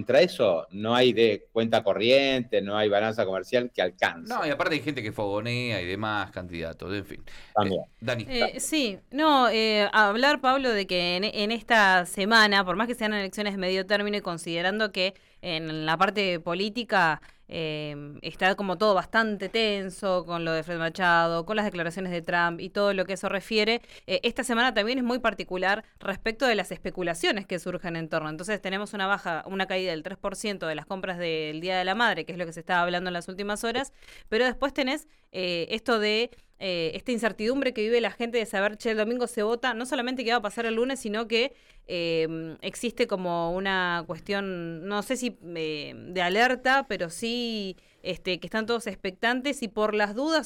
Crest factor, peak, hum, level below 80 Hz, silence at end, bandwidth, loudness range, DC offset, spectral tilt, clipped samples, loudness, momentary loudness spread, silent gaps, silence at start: 18 dB; -10 dBFS; none; -54 dBFS; 0 s; 18 kHz; 6 LU; under 0.1%; -4 dB/octave; under 0.1%; -26 LUFS; 11 LU; none; 0 s